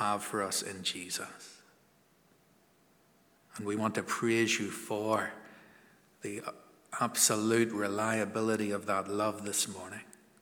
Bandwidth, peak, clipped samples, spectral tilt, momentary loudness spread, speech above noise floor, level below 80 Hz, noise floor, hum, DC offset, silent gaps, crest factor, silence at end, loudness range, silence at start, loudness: over 20 kHz; -12 dBFS; under 0.1%; -3 dB/octave; 17 LU; 34 dB; -82 dBFS; -67 dBFS; none; under 0.1%; none; 22 dB; 0.3 s; 9 LU; 0 s; -32 LUFS